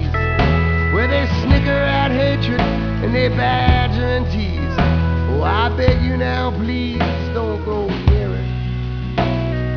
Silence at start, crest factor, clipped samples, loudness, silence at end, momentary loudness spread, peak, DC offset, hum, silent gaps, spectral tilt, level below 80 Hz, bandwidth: 0 s; 16 dB; under 0.1%; -18 LUFS; 0 s; 6 LU; 0 dBFS; 0.4%; none; none; -8 dB/octave; -24 dBFS; 5.4 kHz